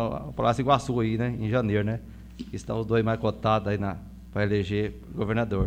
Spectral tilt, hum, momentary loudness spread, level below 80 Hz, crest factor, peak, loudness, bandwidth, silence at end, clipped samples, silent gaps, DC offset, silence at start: -7.5 dB/octave; none; 12 LU; -44 dBFS; 20 dB; -8 dBFS; -27 LUFS; 9.4 kHz; 0 s; under 0.1%; none; under 0.1%; 0 s